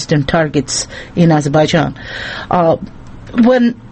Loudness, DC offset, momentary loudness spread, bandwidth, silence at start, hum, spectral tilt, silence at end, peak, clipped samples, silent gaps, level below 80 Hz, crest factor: -14 LUFS; under 0.1%; 12 LU; 8.8 kHz; 0 s; none; -5.5 dB/octave; 0 s; 0 dBFS; under 0.1%; none; -38 dBFS; 14 dB